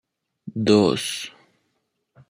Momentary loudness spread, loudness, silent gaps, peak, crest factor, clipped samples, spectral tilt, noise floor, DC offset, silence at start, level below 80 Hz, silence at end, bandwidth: 19 LU; -21 LUFS; none; -4 dBFS; 22 dB; under 0.1%; -5 dB/octave; -74 dBFS; under 0.1%; 0.45 s; -64 dBFS; 1 s; 15.5 kHz